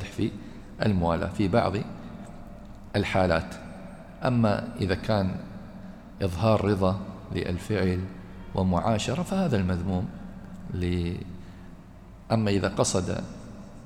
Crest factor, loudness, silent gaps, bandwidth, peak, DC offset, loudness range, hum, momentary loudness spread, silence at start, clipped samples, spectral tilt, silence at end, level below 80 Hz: 18 dB; -27 LUFS; none; 14 kHz; -10 dBFS; under 0.1%; 3 LU; none; 19 LU; 0 s; under 0.1%; -6 dB/octave; 0 s; -48 dBFS